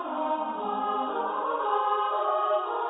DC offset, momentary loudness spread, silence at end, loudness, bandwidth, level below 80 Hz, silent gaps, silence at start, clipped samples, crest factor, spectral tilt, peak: under 0.1%; 4 LU; 0 s; -28 LUFS; 4 kHz; -76 dBFS; none; 0 s; under 0.1%; 14 dB; -7.5 dB/octave; -14 dBFS